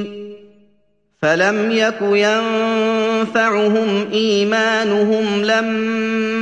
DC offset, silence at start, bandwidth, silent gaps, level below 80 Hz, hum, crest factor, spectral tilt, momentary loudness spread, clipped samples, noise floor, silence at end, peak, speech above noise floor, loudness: under 0.1%; 0 s; 9 kHz; none; -64 dBFS; none; 14 dB; -4.5 dB/octave; 4 LU; under 0.1%; -62 dBFS; 0 s; -2 dBFS; 46 dB; -16 LUFS